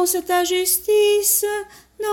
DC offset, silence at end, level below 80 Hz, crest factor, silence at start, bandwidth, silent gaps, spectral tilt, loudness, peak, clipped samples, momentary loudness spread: under 0.1%; 0 s; -56 dBFS; 14 dB; 0 s; 17.5 kHz; none; -0.5 dB/octave; -17 LUFS; -4 dBFS; under 0.1%; 11 LU